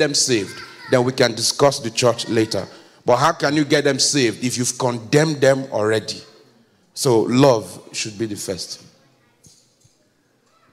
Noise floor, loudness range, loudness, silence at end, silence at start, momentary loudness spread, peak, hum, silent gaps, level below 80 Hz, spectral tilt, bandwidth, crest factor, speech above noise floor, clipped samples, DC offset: -61 dBFS; 3 LU; -18 LUFS; 1.95 s; 0 s; 14 LU; -4 dBFS; none; none; -60 dBFS; -4 dB/octave; 16 kHz; 16 dB; 43 dB; under 0.1%; under 0.1%